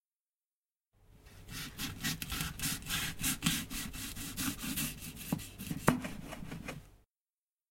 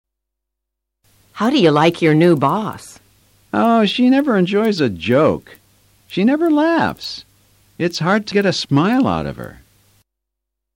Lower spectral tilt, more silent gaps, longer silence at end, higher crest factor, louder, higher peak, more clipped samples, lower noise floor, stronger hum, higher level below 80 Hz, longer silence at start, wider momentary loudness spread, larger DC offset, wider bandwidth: second, -3 dB/octave vs -6.5 dB/octave; neither; second, 0.75 s vs 1.25 s; first, 30 dB vs 14 dB; second, -37 LUFS vs -16 LUFS; second, -10 dBFS vs -2 dBFS; neither; first, under -90 dBFS vs -80 dBFS; neither; about the same, -52 dBFS vs -50 dBFS; second, 1.1 s vs 1.35 s; about the same, 13 LU vs 14 LU; neither; about the same, 16.5 kHz vs 16.5 kHz